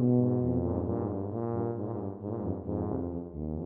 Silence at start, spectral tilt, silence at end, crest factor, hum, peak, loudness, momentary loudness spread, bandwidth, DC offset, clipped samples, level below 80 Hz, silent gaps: 0 s; -14.5 dB/octave; 0 s; 14 dB; none; -16 dBFS; -32 LUFS; 9 LU; 2.2 kHz; under 0.1%; under 0.1%; -50 dBFS; none